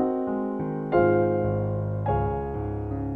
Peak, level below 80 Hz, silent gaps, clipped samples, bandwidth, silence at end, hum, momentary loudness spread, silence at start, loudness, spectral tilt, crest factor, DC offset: -8 dBFS; -40 dBFS; none; under 0.1%; 4.5 kHz; 0 s; none; 9 LU; 0 s; -26 LUFS; -11.5 dB/octave; 16 dB; under 0.1%